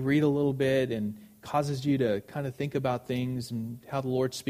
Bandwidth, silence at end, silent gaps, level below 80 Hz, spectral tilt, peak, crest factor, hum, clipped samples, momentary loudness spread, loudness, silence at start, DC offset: 15.5 kHz; 0 s; none; -62 dBFS; -6.5 dB/octave; -14 dBFS; 14 dB; none; under 0.1%; 10 LU; -30 LUFS; 0 s; under 0.1%